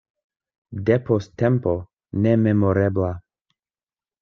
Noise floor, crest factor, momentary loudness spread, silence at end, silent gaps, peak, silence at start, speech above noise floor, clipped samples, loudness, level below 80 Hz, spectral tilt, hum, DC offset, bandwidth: under -90 dBFS; 18 dB; 11 LU; 1 s; none; -4 dBFS; 0.7 s; over 70 dB; under 0.1%; -21 LUFS; -56 dBFS; -9.5 dB/octave; none; under 0.1%; 6.6 kHz